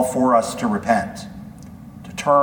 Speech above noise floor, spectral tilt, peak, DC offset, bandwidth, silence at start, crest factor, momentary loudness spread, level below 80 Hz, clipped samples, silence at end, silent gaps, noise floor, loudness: 19 dB; -5 dB/octave; -2 dBFS; under 0.1%; 19 kHz; 0 s; 18 dB; 22 LU; -50 dBFS; under 0.1%; 0 s; none; -38 dBFS; -20 LUFS